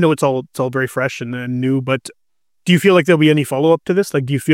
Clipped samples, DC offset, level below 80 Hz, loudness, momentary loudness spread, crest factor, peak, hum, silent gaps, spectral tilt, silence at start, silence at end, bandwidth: under 0.1%; under 0.1%; -60 dBFS; -16 LUFS; 10 LU; 14 dB; -2 dBFS; none; none; -6 dB/octave; 0 s; 0 s; 16.5 kHz